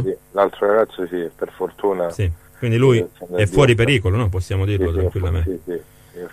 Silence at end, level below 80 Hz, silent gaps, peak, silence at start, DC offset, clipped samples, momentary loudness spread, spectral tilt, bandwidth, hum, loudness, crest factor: 0.05 s; -34 dBFS; none; -4 dBFS; 0 s; under 0.1%; under 0.1%; 11 LU; -7 dB/octave; 14.5 kHz; none; -19 LUFS; 16 dB